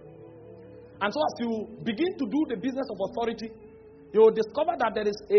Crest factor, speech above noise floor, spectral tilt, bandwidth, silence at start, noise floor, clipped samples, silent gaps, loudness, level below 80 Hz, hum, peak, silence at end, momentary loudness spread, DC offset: 18 dB; 21 dB; -4 dB/octave; 6.4 kHz; 0 s; -47 dBFS; under 0.1%; none; -27 LUFS; -64 dBFS; none; -8 dBFS; 0 s; 26 LU; under 0.1%